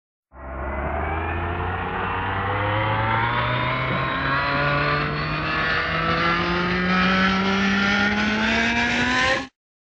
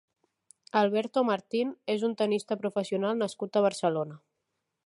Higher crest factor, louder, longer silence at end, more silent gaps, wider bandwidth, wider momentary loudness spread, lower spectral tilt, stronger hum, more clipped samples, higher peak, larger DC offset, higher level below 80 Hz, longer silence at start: about the same, 14 dB vs 18 dB; first, -21 LUFS vs -29 LUFS; second, 0.45 s vs 0.7 s; neither; second, 8.6 kHz vs 11.5 kHz; about the same, 7 LU vs 5 LU; about the same, -5.5 dB/octave vs -5.5 dB/octave; neither; neither; first, -8 dBFS vs -12 dBFS; neither; first, -38 dBFS vs -82 dBFS; second, 0.35 s vs 0.75 s